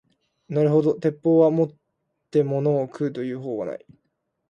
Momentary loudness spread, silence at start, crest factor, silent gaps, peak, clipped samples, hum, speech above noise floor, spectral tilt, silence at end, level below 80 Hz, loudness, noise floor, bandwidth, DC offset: 12 LU; 0.5 s; 18 dB; none; -6 dBFS; under 0.1%; none; 55 dB; -9.5 dB/octave; 0.7 s; -70 dBFS; -23 LUFS; -76 dBFS; 7.2 kHz; under 0.1%